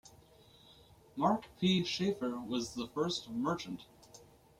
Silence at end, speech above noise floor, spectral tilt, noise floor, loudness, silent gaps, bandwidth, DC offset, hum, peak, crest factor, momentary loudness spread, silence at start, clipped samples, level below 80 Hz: 0.35 s; 27 dB; -5 dB/octave; -61 dBFS; -35 LUFS; none; 14.5 kHz; under 0.1%; none; -18 dBFS; 20 dB; 14 LU; 0.05 s; under 0.1%; -68 dBFS